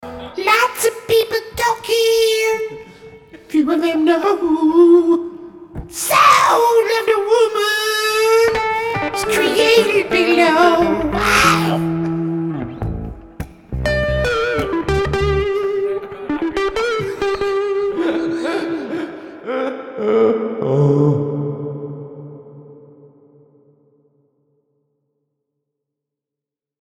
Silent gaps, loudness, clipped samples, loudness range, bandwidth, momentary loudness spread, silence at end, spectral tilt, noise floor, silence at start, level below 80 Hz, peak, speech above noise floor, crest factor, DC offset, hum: none; -16 LUFS; under 0.1%; 7 LU; 18.5 kHz; 16 LU; 4 s; -5 dB/octave; -86 dBFS; 0 s; -36 dBFS; 0 dBFS; 73 dB; 16 dB; under 0.1%; none